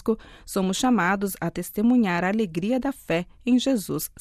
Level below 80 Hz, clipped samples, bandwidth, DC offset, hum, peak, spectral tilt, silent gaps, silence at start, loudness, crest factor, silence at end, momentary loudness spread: -52 dBFS; under 0.1%; 15.5 kHz; under 0.1%; none; -10 dBFS; -5 dB/octave; none; 0.05 s; -24 LUFS; 14 dB; 0.15 s; 8 LU